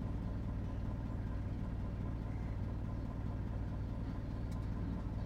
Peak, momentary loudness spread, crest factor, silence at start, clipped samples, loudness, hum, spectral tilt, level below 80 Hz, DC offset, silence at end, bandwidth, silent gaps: -28 dBFS; 1 LU; 12 dB; 0 s; under 0.1%; -42 LUFS; none; -9 dB/octave; -44 dBFS; under 0.1%; 0 s; 7 kHz; none